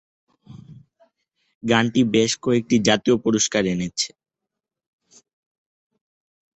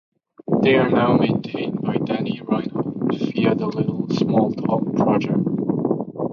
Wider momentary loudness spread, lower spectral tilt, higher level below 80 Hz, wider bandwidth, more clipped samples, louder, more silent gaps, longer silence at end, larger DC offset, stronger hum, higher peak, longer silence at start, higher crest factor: about the same, 7 LU vs 7 LU; second, -4 dB/octave vs -8.5 dB/octave; about the same, -58 dBFS vs -56 dBFS; first, 8.4 kHz vs 7 kHz; neither; about the same, -20 LUFS vs -21 LUFS; first, 1.55-1.61 s vs none; first, 2.5 s vs 0 s; neither; neither; about the same, -2 dBFS vs -4 dBFS; about the same, 0.5 s vs 0.45 s; about the same, 20 dB vs 16 dB